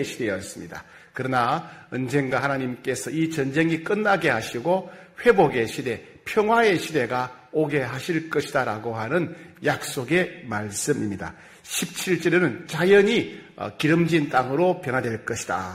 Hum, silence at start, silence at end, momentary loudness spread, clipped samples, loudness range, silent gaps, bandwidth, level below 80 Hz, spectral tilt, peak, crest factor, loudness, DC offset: none; 0 s; 0 s; 12 LU; under 0.1%; 5 LU; none; 16 kHz; -60 dBFS; -5 dB/octave; -4 dBFS; 20 dB; -23 LUFS; under 0.1%